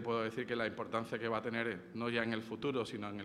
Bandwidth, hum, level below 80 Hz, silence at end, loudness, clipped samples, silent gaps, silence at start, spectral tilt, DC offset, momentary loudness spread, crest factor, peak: 13 kHz; none; -72 dBFS; 0 s; -38 LUFS; under 0.1%; none; 0 s; -6 dB/octave; under 0.1%; 4 LU; 20 dB; -20 dBFS